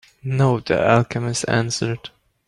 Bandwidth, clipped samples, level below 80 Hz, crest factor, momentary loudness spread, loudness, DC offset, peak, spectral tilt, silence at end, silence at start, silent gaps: 11.5 kHz; under 0.1%; -50 dBFS; 18 dB; 10 LU; -20 LUFS; under 0.1%; -2 dBFS; -5.5 dB/octave; 0.4 s; 0.25 s; none